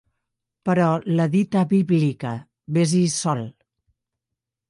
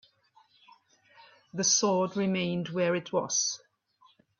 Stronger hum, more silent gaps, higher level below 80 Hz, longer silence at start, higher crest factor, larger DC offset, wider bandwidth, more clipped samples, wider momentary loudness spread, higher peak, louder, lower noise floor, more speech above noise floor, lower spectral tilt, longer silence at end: neither; neither; first, -64 dBFS vs -74 dBFS; second, 0.65 s vs 1.55 s; about the same, 14 dB vs 18 dB; neither; first, 11.5 kHz vs 7.6 kHz; neither; first, 11 LU vs 8 LU; first, -8 dBFS vs -12 dBFS; first, -21 LUFS vs -28 LUFS; first, -85 dBFS vs -65 dBFS; first, 65 dB vs 37 dB; first, -6 dB/octave vs -3 dB/octave; first, 1.2 s vs 0.8 s